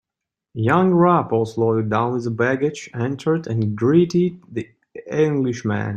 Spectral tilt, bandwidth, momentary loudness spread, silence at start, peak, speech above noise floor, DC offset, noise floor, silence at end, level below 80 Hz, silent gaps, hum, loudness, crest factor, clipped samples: -8 dB/octave; 9 kHz; 14 LU; 0.55 s; -2 dBFS; 66 dB; under 0.1%; -85 dBFS; 0 s; -58 dBFS; none; none; -20 LUFS; 18 dB; under 0.1%